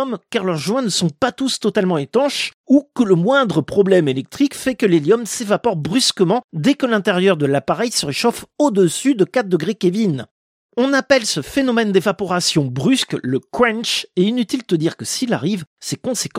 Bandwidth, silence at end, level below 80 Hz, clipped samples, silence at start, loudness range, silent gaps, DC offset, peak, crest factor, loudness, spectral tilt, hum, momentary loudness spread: 16 kHz; 0 s; -56 dBFS; under 0.1%; 0 s; 2 LU; 2.54-2.64 s, 6.44-6.49 s, 10.31-10.69 s, 15.67-15.76 s; under 0.1%; 0 dBFS; 16 dB; -17 LUFS; -4.5 dB/octave; none; 6 LU